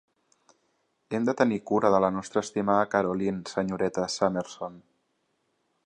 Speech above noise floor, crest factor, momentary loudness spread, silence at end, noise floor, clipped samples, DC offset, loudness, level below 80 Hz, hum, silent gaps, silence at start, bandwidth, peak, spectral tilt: 48 dB; 22 dB; 10 LU; 1.05 s; -74 dBFS; under 0.1%; under 0.1%; -27 LUFS; -64 dBFS; none; none; 1.1 s; 10.5 kHz; -6 dBFS; -5.5 dB/octave